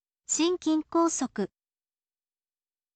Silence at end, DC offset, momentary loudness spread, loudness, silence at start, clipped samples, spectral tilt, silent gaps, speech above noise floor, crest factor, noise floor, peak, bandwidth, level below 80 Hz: 1.5 s; under 0.1%; 9 LU; -28 LUFS; 0.3 s; under 0.1%; -3 dB/octave; none; over 63 dB; 16 dB; under -90 dBFS; -16 dBFS; 9 kHz; -70 dBFS